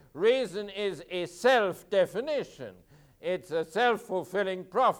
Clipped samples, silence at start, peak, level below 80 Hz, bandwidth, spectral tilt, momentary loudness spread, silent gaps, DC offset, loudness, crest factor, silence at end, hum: under 0.1%; 0.15 s; -12 dBFS; -68 dBFS; 17.5 kHz; -4.5 dB/octave; 11 LU; none; under 0.1%; -29 LUFS; 16 dB; 0 s; none